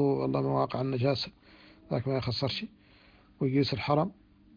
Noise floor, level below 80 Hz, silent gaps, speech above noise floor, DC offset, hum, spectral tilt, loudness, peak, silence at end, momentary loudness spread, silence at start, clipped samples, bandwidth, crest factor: -59 dBFS; -60 dBFS; none; 30 dB; under 0.1%; none; -8 dB/octave; -30 LUFS; -12 dBFS; 0.45 s; 8 LU; 0 s; under 0.1%; 5.2 kHz; 20 dB